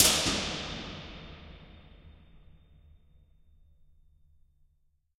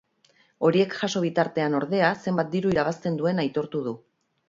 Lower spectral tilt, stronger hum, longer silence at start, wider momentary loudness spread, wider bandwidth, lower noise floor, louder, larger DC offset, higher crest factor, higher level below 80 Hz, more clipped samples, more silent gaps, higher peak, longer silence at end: second, -1.5 dB/octave vs -6 dB/octave; neither; second, 0 s vs 0.6 s; first, 28 LU vs 7 LU; first, 16 kHz vs 7.6 kHz; first, -70 dBFS vs -63 dBFS; second, -30 LUFS vs -25 LUFS; neither; first, 32 dB vs 18 dB; first, -52 dBFS vs -60 dBFS; neither; neither; about the same, -4 dBFS vs -6 dBFS; first, 2.8 s vs 0.5 s